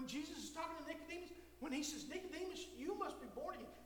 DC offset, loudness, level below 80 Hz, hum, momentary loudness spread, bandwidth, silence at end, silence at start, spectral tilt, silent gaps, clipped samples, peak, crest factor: under 0.1%; -48 LUFS; -68 dBFS; none; 6 LU; 19.5 kHz; 0 s; 0 s; -3 dB/octave; none; under 0.1%; -30 dBFS; 16 dB